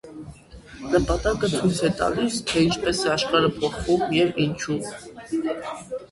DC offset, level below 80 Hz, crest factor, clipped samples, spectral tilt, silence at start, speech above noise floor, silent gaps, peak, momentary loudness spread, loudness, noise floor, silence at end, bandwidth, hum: under 0.1%; -40 dBFS; 18 dB; under 0.1%; -5 dB/octave; 0.05 s; 21 dB; none; -6 dBFS; 14 LU; -23 LUFS; -44 dBFS; 0.05 s; 11.5 kHz; none